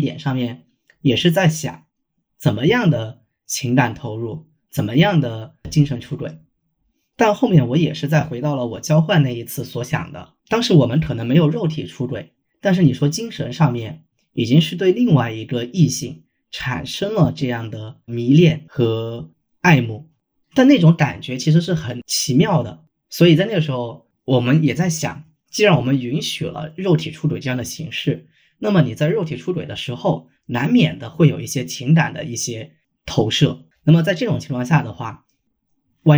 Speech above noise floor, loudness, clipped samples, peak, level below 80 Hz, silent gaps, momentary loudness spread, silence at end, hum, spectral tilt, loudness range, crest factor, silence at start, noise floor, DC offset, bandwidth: 55 dB; -18 LUFS; under 0.1%; -2 dBFS; -50 dBFS; none; 14 LU; 0 s; none; -6 dB/octave; 4 LU; 16 dB; 0 s; -73 dBFS; under 0.1%; over 20 kHz